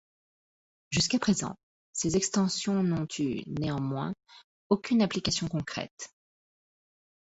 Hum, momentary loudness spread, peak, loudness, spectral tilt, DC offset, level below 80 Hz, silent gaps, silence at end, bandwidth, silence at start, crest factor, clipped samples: none; 13 LU; -10 dBFS; -29 LUFS; -4.5 dB/octave; under 0.1%; -58 dBFS; 1.63-1.93 s, 4.44-4.70 s, 5.91-5.97 s; 1.15 s; 8.4 kHz; 0.9 s; 22 dB; under 0.1%